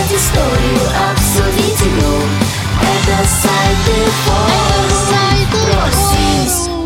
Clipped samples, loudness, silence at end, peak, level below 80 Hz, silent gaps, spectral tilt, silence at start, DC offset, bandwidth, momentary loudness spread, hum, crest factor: under 0.1%; -12 LUFS; 0 s; 0 dBFS; -20 dBFS; none; -4 dB/octave; 0 s; under 0.1%; 17 kHz; 2 LU; none; 12 dB